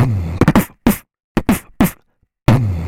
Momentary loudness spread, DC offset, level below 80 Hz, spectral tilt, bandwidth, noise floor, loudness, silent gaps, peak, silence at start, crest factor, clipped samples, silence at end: 7 LU; under 0.1%; -30 dBFS; -6.5 dB/octave; 18 kHz; -56 dBFS; -17 LUFS; 1.24-1.35 s; 0 dBFS; 0 s; 16 dB; under 0.1%; 0 s